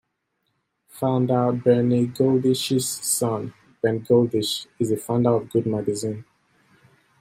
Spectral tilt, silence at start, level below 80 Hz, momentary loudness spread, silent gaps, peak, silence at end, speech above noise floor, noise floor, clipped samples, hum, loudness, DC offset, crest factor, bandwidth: -5.5 dB/octave; 0.95 s; -64 dBFS; 8 LU; none; -6 dBFS; 1 s; 53 dB; -75 dBFS; under 0.1%; none; -22 LUFS; under 0.1%; 18 dB; 16 kHz